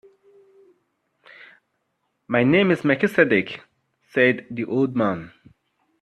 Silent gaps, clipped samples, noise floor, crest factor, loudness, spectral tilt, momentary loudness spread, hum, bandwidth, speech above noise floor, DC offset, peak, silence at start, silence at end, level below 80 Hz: none; under 0.1%; -74 dBFS; 20 dB; -20 LUFS; -7.5 dB/octave; 11 LU; none; 12.5 kHz; 54 dB; under 0.1%; -2 dBFS; 2.3 s; 0.75 s; -64 dBFS